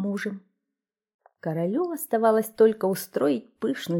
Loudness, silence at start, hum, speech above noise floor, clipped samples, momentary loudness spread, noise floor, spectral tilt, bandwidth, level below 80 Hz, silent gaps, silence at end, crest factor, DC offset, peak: -25 LUFS; 0 s; none; 62 dB; under 0.1%; 12 LU; -87 dBFS; -6 dB/octave; 18 kHz; -74 dBFS; 1.14-1.19 s; 0 s; 18 dB; under 0.1%; -8 dBFS